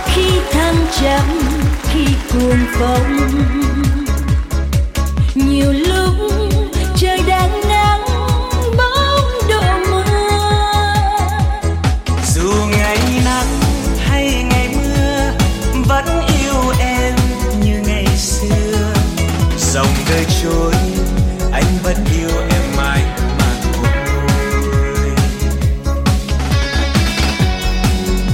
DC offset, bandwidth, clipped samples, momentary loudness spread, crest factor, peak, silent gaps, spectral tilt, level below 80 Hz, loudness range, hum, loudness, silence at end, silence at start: under 0.1%; 16.5 kHz; under 0.1%; 3 LU; 12 dB; 0 dBFS; none; -5 dB/octave; -18 dBFS; 2 LU; none; -15 LUFS; 0 s; 0 s